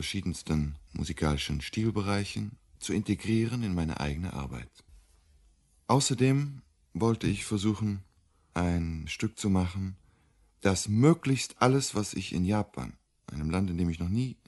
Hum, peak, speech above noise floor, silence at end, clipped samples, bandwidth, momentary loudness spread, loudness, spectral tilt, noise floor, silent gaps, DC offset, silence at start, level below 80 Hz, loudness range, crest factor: none; -8 dBFS; 36 dB; 0.15 s; under 0.1%; 11.5 kHz; 14 LU; -30 LUFS; -5.5 dB/octave; -65 dBFS; none; under 0.1%; 0 s; -46 dBFS; 4 LU; 22 dB